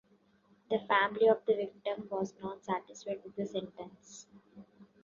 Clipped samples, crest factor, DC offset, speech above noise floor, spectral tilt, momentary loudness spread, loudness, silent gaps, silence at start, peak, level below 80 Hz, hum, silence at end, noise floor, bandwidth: under 0.1%; 22 dB; under 0.1%; 34 dB; -3 dB/octave; 21 LU; -33 LUFS; none; 0.7 s; -14 dBFS; -76 dBFS; none; 0.2 s; -68 dBFS; 7.4 kHz